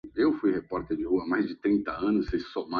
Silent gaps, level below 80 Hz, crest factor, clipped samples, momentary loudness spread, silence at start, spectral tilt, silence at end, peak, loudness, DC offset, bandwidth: none; -50 dBFS; 14 dB; under 0.1%; 6 LU; 0.05 s; -8.5 dB/octave; 0 s; -14 dBFS; -28 LUFS; under 0.1%; 5.6 kHz